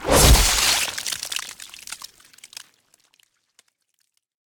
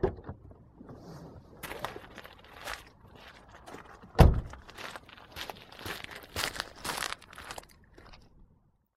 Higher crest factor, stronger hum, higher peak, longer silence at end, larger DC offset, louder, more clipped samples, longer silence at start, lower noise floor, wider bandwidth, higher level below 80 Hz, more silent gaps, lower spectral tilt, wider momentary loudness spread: second, 20 dB vs 32 dB; neither; about the same, -2 dBFS vs -2 dBFS; first, 2.5 s vs 0.8 s; neither; first, -18 LUFS vs -33 LUFS; neither; about the same, 0 s vs 0 s; first, -71 dBFS vs -67 dBFS; first, 19.5 kHz vs 16 kHz; first, -28 dBFS vs -38 dBFS; neither; second, -2.5 dB/octave vs -5.5 dB/octave; first, 27 LU vs 19 LU